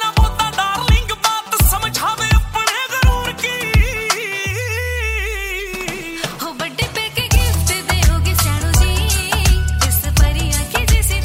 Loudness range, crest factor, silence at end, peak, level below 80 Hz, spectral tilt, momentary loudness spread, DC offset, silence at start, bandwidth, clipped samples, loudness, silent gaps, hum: 4 LU; 16 dB; 0 s; 0 dBFS; -20 dBFS; -3.5 dB/octave; 7 LU; under 0.1%; 0 s; 16.5 kHz; under 0.1%; -17 LUFS; none; none